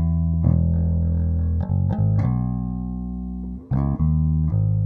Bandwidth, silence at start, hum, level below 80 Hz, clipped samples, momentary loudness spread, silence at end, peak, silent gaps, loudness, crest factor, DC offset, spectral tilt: 2.3 kHz; 0 s; none; -28 dBFS; under 0.1%; 10 LU; 0 s; -4 dBFS; none; -22 LUFS; 16 dB; under 0.1%; -13 dB/octave